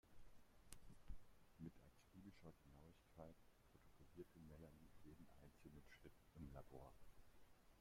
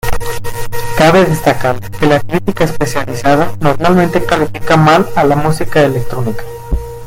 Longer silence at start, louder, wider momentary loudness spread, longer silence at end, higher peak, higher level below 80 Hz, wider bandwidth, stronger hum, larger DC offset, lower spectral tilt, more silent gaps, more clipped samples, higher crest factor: about the same, 0.05 s vs 0.05 s; second, -66 LUFS vs -12 LUFS; second, 6 LU vs 13 LU; about the same, 0 s vs 0 s; second, -36 dBFS vs 0 dBFS; second, -70 dBFS vs -26 dBFS; about the same, 16 kHz vs 17 kHz; neither; neither; about the same, -6 dB/octave vs -6 dB/octave; neither; second, under 0.1% vs 0.4%; first, 26 dB vs 10 dB